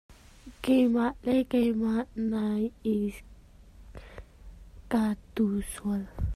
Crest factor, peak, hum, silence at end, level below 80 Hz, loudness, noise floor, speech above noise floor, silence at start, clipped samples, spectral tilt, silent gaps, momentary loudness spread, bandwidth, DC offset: 16 dB; -14 dBFS; none; 0 s; -46 dBFS; -29 LUFS; -52 dBFS; 25 dB; 0.1 s; under 0.1%; -6.5 dB/octave; none; 23 LU; 14.5 kHz; under 0.1%